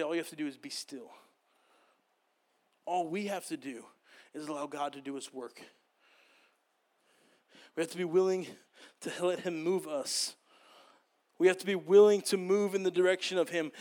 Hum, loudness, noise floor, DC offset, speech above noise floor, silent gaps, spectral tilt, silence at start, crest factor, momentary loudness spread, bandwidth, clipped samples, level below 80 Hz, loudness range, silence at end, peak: none; -31 LUFS; -76 dBFS; under 0.1%; 45 dB; none; -4 dB/octave; 0 s; 22 dB; 19 LU; 17.5 kHz; under 0.1%; under -90 dBFS; 15 LU; 0 s; -12 dBFS